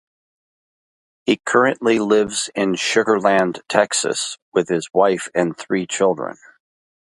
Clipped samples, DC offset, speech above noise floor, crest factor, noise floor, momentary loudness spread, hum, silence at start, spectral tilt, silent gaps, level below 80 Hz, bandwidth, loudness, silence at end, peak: under 0.1%; under 0.1%; over 72 dB; 20 dB; under -90 dBFS; 6 LU; none; 1.25 s; -3.5 dB/octave; 4.42-4.52 s; -62 dBFS; 11.5 kHz; -19 LUFS; 0.85 s; 0 dBFS